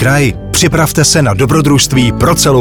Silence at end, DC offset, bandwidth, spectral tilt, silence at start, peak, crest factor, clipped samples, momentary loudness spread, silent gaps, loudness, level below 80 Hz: 0 s; under 0.1%; 19.5 kHz; -4.5 dB/octave; 0 s; 0 dBFS; 8 dB; under 0.1%; 3 LU; none; -9 LUFS; -26 dBFS